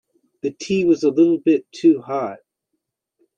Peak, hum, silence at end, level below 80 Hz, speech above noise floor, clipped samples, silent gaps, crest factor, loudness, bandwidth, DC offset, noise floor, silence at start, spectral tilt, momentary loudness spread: -4 dBFS; none; 1 s; -64 dBFS; 59 dB; under 0.1%; none; 16 dB; -19 LUFS; 7.6 kHz; under 0.1%; -77 dBFS; 0.45 s; -6.5 dB/octave; 13 LU